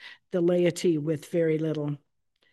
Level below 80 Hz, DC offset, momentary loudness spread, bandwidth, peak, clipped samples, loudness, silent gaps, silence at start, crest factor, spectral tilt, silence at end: -76 dBFS; under 0.1%; 9 LU; 12.5 kHz; -12 dBFS; under 0.1%; -27 LUFS; none; 0 s; 16 dB; -6.5 dB/octave; 0.55 s